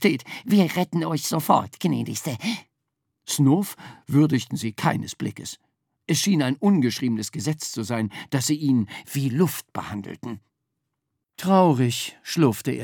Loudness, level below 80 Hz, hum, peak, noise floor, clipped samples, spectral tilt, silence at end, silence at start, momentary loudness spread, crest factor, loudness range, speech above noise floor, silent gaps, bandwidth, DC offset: -23 LUFS; -70 dBFS; none; -2 dBFS; -80 dBFS; under 0.1%; -5.5 dB/octave; 0 s; 0 s; 13 LU; 20 dB; 2 LU; 57 dB; none; over 20 kHz; under 0.1%